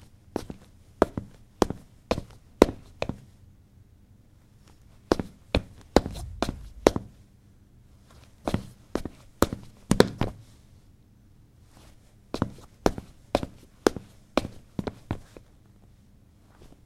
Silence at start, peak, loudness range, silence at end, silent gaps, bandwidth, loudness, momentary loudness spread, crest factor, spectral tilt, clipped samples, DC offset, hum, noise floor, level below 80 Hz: 0.35 s; 0 dBFS; 5 LU; 1.45 s; none; 16 kHz; -29 LUFS; 18 LU; 30 dB; -5.5 dB/octave; under 0.1%; under 0.1%; none; -56 dBFS; -44 dBFS